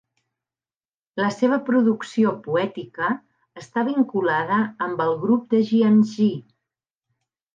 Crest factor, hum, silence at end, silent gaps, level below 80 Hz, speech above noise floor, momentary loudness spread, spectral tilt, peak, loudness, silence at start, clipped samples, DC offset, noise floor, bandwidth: 14 dB; none; 1.15 s; none; -74 dBFS; over 69 dB; 9 LU; -7 dB/octave; -8 dBFS; -21 LUFS; 1.15 s; under 0.1%; under 0.1%; under -90 dBFS; 7.4 kHz